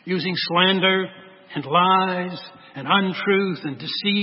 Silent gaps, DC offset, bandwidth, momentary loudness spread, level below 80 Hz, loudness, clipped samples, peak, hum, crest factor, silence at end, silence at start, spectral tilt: none; under 0.1%; 5.8 kHz; 16 LU; -72 dBFS; -20 LUFS; under 0.1%; -4 dBFS; none; 18 dB; 0 s; 0.05 s; -9.5 dB/octave